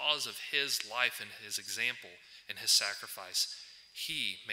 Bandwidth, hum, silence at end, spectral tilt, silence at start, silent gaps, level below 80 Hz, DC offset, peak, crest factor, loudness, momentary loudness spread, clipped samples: 16 kHz; none; 0 s; 1 dB/octave; 0 s; none; -80 dBFS; under 0.1%; -12 dBFS; 22 dB; -33 LUFS; 17 LU; under 0.1%